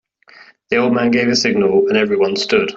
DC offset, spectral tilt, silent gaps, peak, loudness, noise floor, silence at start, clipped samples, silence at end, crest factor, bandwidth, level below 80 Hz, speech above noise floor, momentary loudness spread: under 0.1%; -4.5 dB/octave; none; -2 dBFS; -15 LUFS; -45 dBFS; 0.7 s; under 0.1%; 0 s; 14 dB; 8 kHz; -56 dBFS; 31 dB; 3 LU